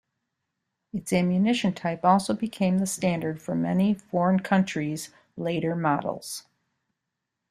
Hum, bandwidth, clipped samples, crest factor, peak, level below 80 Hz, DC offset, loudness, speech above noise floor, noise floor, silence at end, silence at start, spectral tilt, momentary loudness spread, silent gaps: none; 14.5 kHz; under 0.1%; 20 dB; -8 dBFS; -64 dBFS; under 0.1%; -26 LUFS; 58 dB; -83 dBFS; 1.1 s; 0.95 s; -6 dB/octave; 13 LU; none